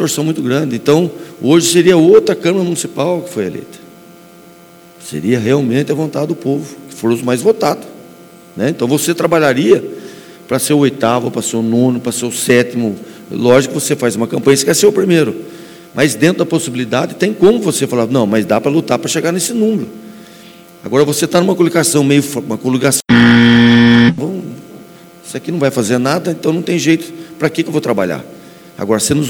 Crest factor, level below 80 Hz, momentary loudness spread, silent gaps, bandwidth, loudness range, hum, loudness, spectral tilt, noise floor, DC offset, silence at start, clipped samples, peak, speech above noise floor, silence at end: 14 dB; -52 dBFS; 14 LU; none; 18.5 kHz; 6 LU; none; -13 LUFS; -5 dB/octave; -40 dBFS; under 0.1%; 0 s; 0.2%; 0 dBFS; 27 dB; 0 s